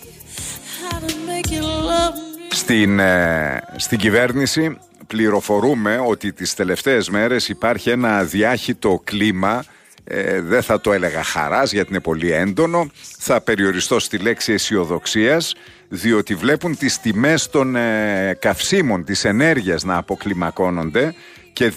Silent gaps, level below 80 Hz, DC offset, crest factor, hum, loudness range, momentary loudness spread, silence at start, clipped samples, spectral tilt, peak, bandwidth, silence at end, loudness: none; -44 dBFS; under 0.1%; 16 dB; none; 2 LU; 8 LU; 0 s; under 0.1%; -4 dB/octave; -4 dBFS; 15.5 kHz; 0 s; -18 LUFS